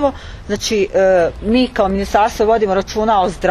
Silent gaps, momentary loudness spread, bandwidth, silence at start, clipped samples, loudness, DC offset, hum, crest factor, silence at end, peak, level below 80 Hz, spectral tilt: none; 7 LU; 13 kHz; 0 s; under 0.1%; -15 LUFS; under 0.1%; none; 14 dB; 0 s; 0 dBFS; -34 dBFS; -5 dB/octave